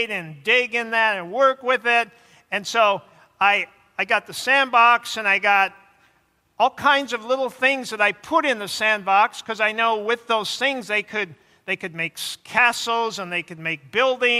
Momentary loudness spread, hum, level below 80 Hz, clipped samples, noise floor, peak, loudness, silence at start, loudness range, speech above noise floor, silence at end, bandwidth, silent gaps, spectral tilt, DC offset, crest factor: 10 LU; none; -72 dBFS; under 0.1%; -64 dBFS; -4 dBFS; -20 LUFS; 0 s; 4 LU; 43 dB; 0 s; 15.5 kHz; none; -2.5 dB/octave; under 0.1%; 18 dB